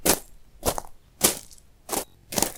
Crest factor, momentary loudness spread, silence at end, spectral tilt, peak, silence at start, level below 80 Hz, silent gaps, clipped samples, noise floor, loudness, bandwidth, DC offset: 28 dB; 13 LU; 0 s; -2 dB/octave; 0 dBFS; 0 s; -44 dBFS; none; under 0.1%; -49 dBFS; -26 LUFS; 19 kHz; under 0.1%